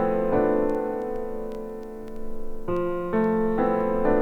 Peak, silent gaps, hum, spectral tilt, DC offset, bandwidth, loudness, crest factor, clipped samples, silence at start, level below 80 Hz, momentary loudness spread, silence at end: -10 dBFS; none; none; -9 dB/octave; under 0.1%; 4.2 kHz; -25 LUFS; 16 dB; under 0.1%; 0 s; -38 dBFS; 15 LU; 0 s